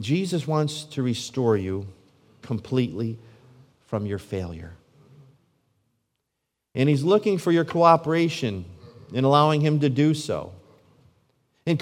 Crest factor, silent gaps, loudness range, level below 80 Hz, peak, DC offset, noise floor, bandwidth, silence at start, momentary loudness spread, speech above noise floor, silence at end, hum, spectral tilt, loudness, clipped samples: 22 dB; none; 14 LU; -64 dBFS; -2 dBFS; under 0.1%; -81 dBFS; 13.5 kHz; 0 s; 17 LU; 58 dB; 0 s; none; -6.5 dB/octave; -23 LUFS; under 0.1%